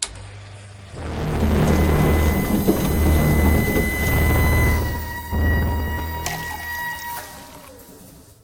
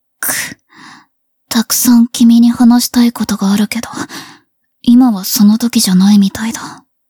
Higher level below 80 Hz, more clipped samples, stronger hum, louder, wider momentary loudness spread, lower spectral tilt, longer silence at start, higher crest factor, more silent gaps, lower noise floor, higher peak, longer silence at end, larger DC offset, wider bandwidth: first, -26 dBFS vs -50 dBFS; neither; neither; second, -20 LUFS vs -10 LUFS; first, 21 LU vs 16 LU; first, -6 dB/octave vs -4 dB/octave; second, 0 s vs 0.2 s; about the same, 16 dB vs 12 dB; neither; second, -45 dBFS vs -56 dBFS; second, -4 dBFS vs 0 dBFS; about the same, 0.25 s vs 0.35 s; neither; second, 17 kHz vs 20 kHz